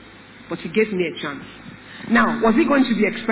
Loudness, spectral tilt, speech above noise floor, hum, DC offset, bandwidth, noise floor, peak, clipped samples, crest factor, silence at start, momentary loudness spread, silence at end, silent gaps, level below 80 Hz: -19 LUFS; -9.5 dB/octave; 24 dB; none; under 0.1%; 4 kHz; -43 dBFS; -6 dBFS; under 0.1%; 14 dB; 0.05 s; 21 LU; 0 s; none; -52 dBFS